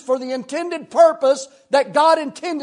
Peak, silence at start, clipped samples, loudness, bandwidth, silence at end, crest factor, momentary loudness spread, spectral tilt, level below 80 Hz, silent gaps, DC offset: -2 dBFS; 0.05 s; under 0.1%; -18 LUFS; 11 kHz; 0 s; 16 dB; 11 LU; -3 dB/octave; -78 dBFS; none; under 0.1%